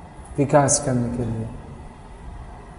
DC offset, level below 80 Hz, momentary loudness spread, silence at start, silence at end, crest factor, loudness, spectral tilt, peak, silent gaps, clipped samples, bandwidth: under 0.1%; -40 dBFS; 24 LU; 0 s; 0 s; 20 dB; -21 LUFS; -5 dB/octave; -4 dBFS; none; under 0.1%; 11 kHz